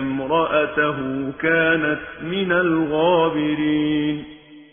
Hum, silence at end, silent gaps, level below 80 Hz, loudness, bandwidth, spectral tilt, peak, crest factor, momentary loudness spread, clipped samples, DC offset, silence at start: none; 0.1 s; none; -50 dBFS; -20 LUFS; 3.6 kHz; -10 dB/octave; -6 dBFS; 14 dB; 9 LU; under 0.1%; under 0.1%; 0 s